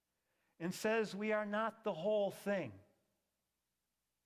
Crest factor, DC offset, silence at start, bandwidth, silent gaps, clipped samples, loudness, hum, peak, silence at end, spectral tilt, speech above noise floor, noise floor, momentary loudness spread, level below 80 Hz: 16 dB; under 0.1%; 0.6 s; 16 kHz; none; under 0.1%; -39 LUFS; none; -24 dBFS; 1.45 s; -5 dB/octave; 51 dB; -89 dBFS; 7 LU; -82 dBFS